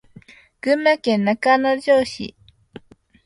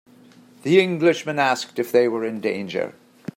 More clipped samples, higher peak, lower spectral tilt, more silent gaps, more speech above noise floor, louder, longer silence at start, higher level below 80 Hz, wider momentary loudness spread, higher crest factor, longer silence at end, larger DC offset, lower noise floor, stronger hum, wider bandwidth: neither; about the same, -4 dBFS vs -4 dBFS; about the same, -5.5 dB/octave vs -5.5 dB/octave; neither; about the same, 29 dB vs 29 dB; first, -18 LUFS vs -21 LUFS; about the same, 0.65 s vs 0.65 s; first, -58 dBFS vs -70 dBFS; about the same, 12 LU vs 12 LU; about the same, 18 dB vs 18 dB; first, 0.95 s vs 0.45 s; neither; about the same, -47 dBFS vs -50 dBFS; neither; second, 11.5 kHz vs 16 kHz